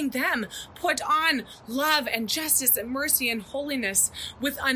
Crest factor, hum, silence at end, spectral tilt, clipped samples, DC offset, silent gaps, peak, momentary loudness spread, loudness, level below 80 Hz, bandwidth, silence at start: 20 dB; none; 0 s; -1 dB/octave; under 0.1%; under 0.1%; none; -6 dBFS; 9 LU; -24 LUFS; -56 dBFS; 16 kHz; 0 s